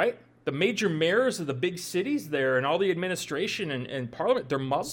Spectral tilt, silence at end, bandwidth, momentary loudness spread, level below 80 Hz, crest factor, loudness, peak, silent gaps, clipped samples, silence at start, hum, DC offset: -4.5 dB/octave; 0 s; 18 kHz; 7 LU; -68 dBFS; 16 dB; -28 LUFS; -12 dBFS; none; under 0.1%; 0 s; none; under 0.1%